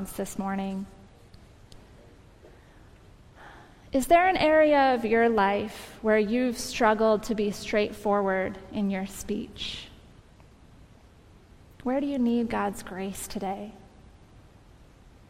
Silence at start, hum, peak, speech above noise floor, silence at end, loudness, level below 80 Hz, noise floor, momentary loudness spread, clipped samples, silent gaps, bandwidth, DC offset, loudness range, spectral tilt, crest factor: 0 s; none; -8 dBFS; 28 dB; 1.5 s; -26 LUFS; -52 dBFS; -54 dBFS; 14 LU; under 0.1%; none; 16 kHz; under 0.1%; 13 LU; -5 dB/octave; 20 dB